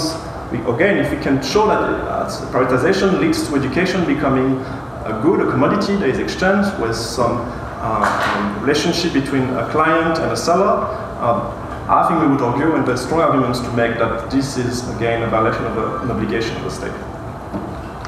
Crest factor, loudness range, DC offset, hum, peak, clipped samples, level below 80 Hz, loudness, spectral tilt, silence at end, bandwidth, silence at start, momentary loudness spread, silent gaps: 16 dB; 2 LU; under 0.1%; none; -2 dBFS; under 0.1%; -38 dBFS; -18 LUFS; -5.5 dB/octave; 0 s; 14.5 kHz; 0 s; 10 LU; none